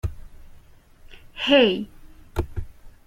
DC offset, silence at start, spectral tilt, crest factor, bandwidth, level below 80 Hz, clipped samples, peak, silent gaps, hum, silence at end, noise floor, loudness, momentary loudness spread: under 0.1%; 0.05 s; -6 dB/octave; 22 dB; 16 kHz; -38 dBFS; under 0.1%; -2 dBFS; none; none; 0.15 s; -49 dBFS; -22 LUFS; 21 LU